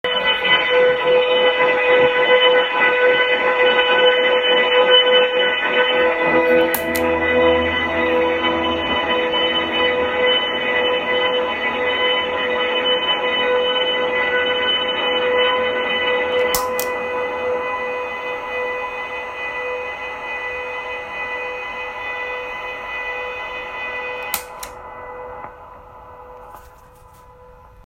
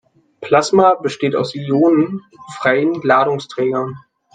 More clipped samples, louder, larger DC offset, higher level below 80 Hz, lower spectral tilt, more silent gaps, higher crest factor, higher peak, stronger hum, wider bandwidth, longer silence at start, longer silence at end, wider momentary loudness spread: neither; about the same, -17 LUFS vs -16 LUFS; neither; first, -50 dBFS vs -62 dBFS; second, -2.5 dB/octave vs -6 dB/octave; neither; about the same, 18 dB vs 16 dB; about the same, 0 dBFS vs 0 dBFS; neither; first, 16 kHz vs 9.4 kHz; second, 0.05 s vs 0.4 s; first, 1.2 s vs 0.35 s; about the same, 12 LU vs 11 LU